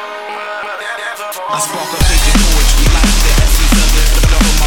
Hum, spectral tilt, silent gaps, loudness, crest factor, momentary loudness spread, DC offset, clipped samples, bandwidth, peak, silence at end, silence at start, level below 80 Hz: none; -3 dB/octave; none; -13 LUFS; 10 dB; 11 LU; under 0.1%; under 0.1%; 17.5 kHz; 0 dBFS; 0 s; 0 s; -12 dBFS